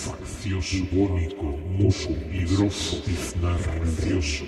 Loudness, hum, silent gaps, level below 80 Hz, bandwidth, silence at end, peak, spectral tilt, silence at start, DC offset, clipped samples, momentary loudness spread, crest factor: -26 LUFS; none; none; -34 dBFS; 12.5 kHz; 0 s; -8 dBFS; -5.5 dB/octave; 0 s; under 0.1%; under 0.1%; 6 LU; 16 dB